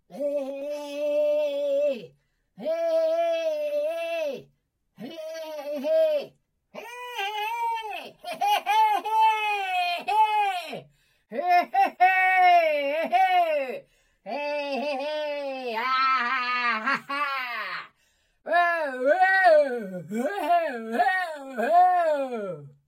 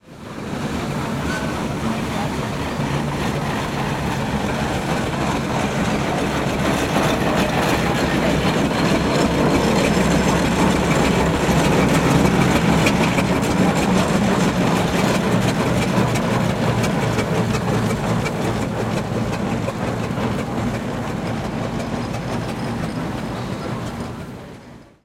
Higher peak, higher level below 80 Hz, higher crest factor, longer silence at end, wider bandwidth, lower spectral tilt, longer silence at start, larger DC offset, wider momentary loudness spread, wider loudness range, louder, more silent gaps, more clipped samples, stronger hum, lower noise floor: second, -8 dBFS vs -2 dBFS; second, -78 dBFS vs -36 dBFS; about the same, 16 dB vs 16 dB; about the same, 0.2 s vs 0.2 s; about the same, 16.5 kHz vs 16.5 kHz; second, -3.5 dB/octave vs -5.5 dB/octave; about the same, 0.1 s vs 0.05 s; neither; first, 16 LU vs 9 LU; about the same, 7 LU vs 7 LU; second, -24 LUFS vs -20 LUFS; neither; neither; neither; first, -70 dBFS vs -41 dBFS